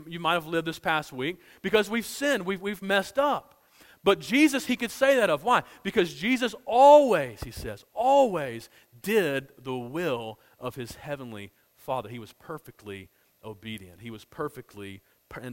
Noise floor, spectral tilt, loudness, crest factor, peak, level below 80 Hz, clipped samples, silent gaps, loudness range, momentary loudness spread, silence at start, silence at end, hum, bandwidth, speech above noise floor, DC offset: -57 dBFS; -4.5 dB/octave; -25 LUFS; 20 dB; -6 dBFS; -58 dBFS; under 0.1%; none; 16 LU; 21 LU; 0 s; 0 s; none; 16.5 kHz; 31 dB; under 0.1%